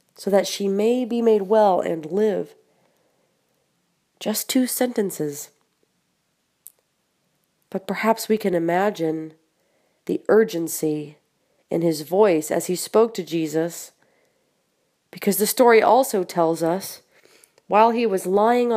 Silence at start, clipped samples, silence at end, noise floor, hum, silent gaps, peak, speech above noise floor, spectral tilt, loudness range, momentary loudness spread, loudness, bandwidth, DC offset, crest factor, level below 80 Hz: 0.2 s; under 0.1%; 0 s; -71 dBFS; none; none; -2 dBFS; 51 dB; -4.5 dB/octave; 7 LU; 14 LU; -21 LUFS; 15.5 kHz; under 0.1%; 20 dB; -76 dBFS